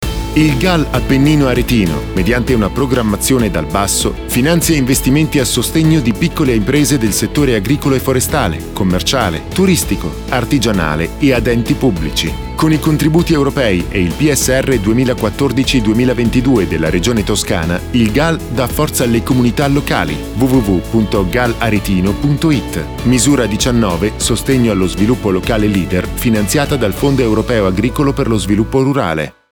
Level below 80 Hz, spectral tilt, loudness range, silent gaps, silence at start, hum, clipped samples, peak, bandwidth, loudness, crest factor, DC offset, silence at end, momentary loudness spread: -26 dBFS; -5 dB/octave; 2 LU; none; 0 s; none; under 0.1%; -2 dBFS; over 20 kHz; -13 LUFS; 12 dB; under 0.1%; 0.2 s; 4 LU